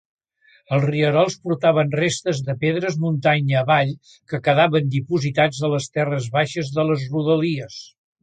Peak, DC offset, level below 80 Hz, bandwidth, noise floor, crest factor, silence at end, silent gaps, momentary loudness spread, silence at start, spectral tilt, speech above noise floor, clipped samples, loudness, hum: -4 dBFS; under 0.1%; -60 dBFS; 9.2 kHz; -58 dBFS; 16 dB; 0.35 s; none; 6 LU; 0.7 s; -6 dB/octave; 38 dB; under 0.1%; -20 LUFS; none